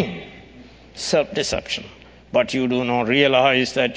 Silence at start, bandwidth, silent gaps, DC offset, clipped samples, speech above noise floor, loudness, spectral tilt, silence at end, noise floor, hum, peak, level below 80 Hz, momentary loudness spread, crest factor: 0 s; 8 kHz; none; under 0.1%; under 0.1%; 25 dB; -20 LUFS; -4 dB/octave; 0 s; -44 dBFS; none; -2 dBFS; -48 dBFS; 14 LU; 20 dB